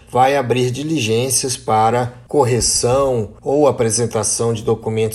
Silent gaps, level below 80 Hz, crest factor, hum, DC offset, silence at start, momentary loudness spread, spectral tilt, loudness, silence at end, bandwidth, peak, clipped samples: none; -42 dBFS; 16 dB; none; under 0.1%; 0.1 s; 5 LU; -4 dB/octave; -16 LUFS; 0 s; 14.5 kHz; -2 dBFS; under 0.1%